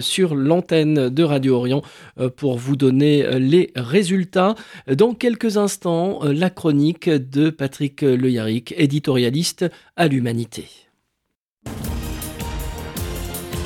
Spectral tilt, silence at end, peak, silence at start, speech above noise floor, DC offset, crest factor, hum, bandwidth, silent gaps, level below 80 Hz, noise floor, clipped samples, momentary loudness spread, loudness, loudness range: -6 dB/octave; 0 s; -2 dBFS; 0 s; 59 dB; under 0.1%; 16 dB; none; 17.5 kHz; 11.36-11.57 s; -40 dBFS; -77 dBFS; under 0.1%; 12 LU; -19 LUFS; 7 LU